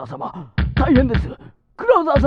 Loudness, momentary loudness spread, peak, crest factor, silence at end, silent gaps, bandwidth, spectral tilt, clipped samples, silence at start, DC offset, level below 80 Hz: -18 LUFS; 15 LU; -2 dBFS; 16 dB; 0 s; none; 5.4 kHz; -9 dB/octave; under 0.1%; 0 s; under 0.1%; -26 dBFS